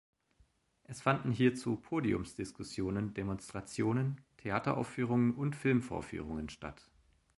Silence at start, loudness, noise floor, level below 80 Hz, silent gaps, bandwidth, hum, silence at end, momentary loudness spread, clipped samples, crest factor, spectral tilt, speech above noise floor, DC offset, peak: 0.9 s; -35 LUFS; -71 dBFS; -58 dBFS; none; 11.5 kHz; none; 0.65 s; 12 LU; under 0.1%; 22 dB; -7 dB/octave; 36 dB; under 0.1%; -14 dBFS